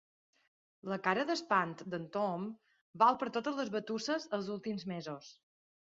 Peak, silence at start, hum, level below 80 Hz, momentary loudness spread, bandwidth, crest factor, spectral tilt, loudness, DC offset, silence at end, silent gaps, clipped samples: -14 dBFS; 0.85 s; none; -80 dBFS; 14 LU; 7.6 kHz; 22 dB; -3.5 dB/octave; -35 LUFS; under 0.1%; 0.6 s; 2.81-2.93 s; under 0.1%